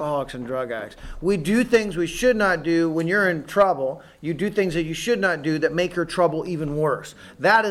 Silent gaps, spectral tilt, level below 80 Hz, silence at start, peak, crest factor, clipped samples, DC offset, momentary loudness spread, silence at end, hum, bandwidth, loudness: none; -5.5 dB/octave; -46 dBFS; 0 s; -6 dBFS; 16 dB; under 0.1%; under 0.1%; 10 LU; 0 s; none; 13.5 kHz; -22 LUFS